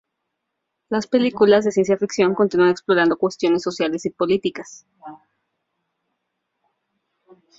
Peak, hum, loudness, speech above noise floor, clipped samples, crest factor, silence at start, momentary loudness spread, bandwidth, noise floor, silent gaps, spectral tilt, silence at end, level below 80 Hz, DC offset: -2 dBFS; none; -19 LUFS; 59 dB; under 0.1%; 18 dB; 0.9 s; 10 LU; 7.8 kHz; -78 dBFS; none; -5.5 dB/octave; 2.45 s; -62 dBFS; under 0.1%